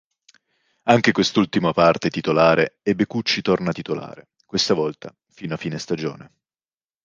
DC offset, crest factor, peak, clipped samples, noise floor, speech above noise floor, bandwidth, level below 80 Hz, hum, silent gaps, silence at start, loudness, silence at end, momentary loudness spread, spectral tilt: under 0.1%; 20 dB; -2 dBFS; under 0.1%; under -90 dBFS; over 70 dB; 9.6 kHz; -56 dBFS; none; none; 0.85 s; -20 LUFS; 0.8 s; 14 LU; -5 dB/octave